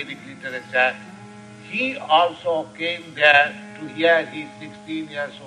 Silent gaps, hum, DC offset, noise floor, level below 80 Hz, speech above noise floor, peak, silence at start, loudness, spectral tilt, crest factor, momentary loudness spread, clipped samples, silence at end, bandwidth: none; none; under 0.1%; -41 dBFS; -72 dBFS; 19 dB; 0 dBFS; 0 s; -20 LUFS; -4 dB/octave; 22 dB; 21 LU; under 0.1%; 0 s; 10.5 kHz